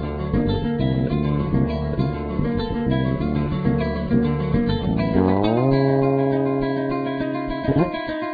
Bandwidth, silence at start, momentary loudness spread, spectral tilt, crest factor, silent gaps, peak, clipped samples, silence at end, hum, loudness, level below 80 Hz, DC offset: 5 kHz; 0 s; 5 LU; -10.5 dB/octave; 16 dB; none; -4 dBFS; under 0.1%; 0 s; none; -21 LUFS; -34 dBFS; under 0.1%